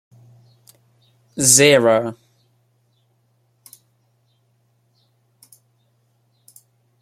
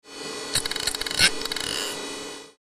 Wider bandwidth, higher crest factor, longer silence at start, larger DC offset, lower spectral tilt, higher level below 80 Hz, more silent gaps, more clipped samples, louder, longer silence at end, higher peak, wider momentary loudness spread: about the same, 16 kHz vs 15.5 kHz; about the same, 24 dB vs 22 dB; first, 1.35 s vs 0.05 s; neither; first, -2.5 dB/octave vs -0.5 dB/octave; second, -64 dBFS vs -50 dBFS; neither; neither; first, -13 LUFS vs -24 LUFS; first, 4.9 s vs 0.2 s; first, 0 dBFS vs -4 dBFS; first, 20 LU vs 14 LU